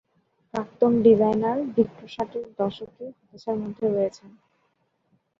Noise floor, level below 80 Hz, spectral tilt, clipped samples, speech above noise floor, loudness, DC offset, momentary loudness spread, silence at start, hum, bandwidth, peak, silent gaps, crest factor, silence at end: -71 dBFS; -64 dBFS; -8 dB/octave; under 0.1%; 47 dB; -24 LUFS; under 0.1%; 20 LU; 0.55 s; none; 7.2 kHz; -6 dBFS; none; 20 dB; 1.1 s